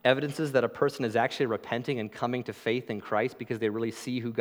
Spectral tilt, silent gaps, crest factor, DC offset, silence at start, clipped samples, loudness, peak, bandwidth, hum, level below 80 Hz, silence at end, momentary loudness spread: -6 dB/octave; none; 22 dB; under 0.1%; 0.05 s; under 0.1%; -30 LUFS; -6 dBFS; 18 kHz; none; -76 dBFS; 0 s; 5 LU